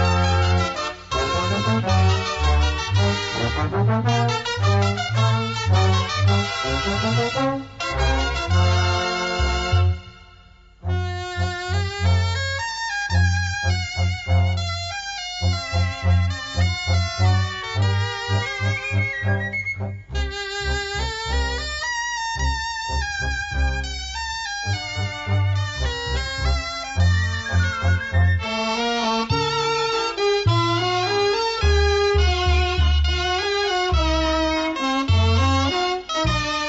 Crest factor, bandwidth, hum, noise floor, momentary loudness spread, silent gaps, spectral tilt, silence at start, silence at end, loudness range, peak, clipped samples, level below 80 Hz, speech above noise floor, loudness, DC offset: 14 dB; 8 kHz; none; -48 dBFS; 7 LU; none; -5 dB/octave; 0 s; 0 s; 5 LU; -8 dBFS; under 0.1%; -30 dBFS; 28 dB; -22 LUFS; under 0.1%